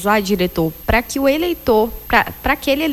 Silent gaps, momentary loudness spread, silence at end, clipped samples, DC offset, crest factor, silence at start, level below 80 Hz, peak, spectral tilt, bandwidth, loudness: none; 3 LU; 0 s; under 0.1%; under 0.1%; 16 dB; 0 s; -32 dBFS; -2 dBFS; -5 dB/octave; 18 kHz; -17 LUFS